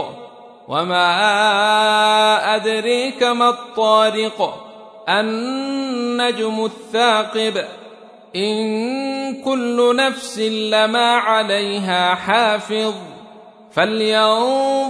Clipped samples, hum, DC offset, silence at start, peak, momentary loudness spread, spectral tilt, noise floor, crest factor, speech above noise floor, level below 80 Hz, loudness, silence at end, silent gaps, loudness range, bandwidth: under 0.1%; none; under 0.1%; 0 s; -2 dBFS; 10 LU; -3.5 dB/octave; -42 dBFS; 16 dB; 25 dB; -70 dBFS; -17 LUFS; 0 s; none; 5 LU; 11 kHz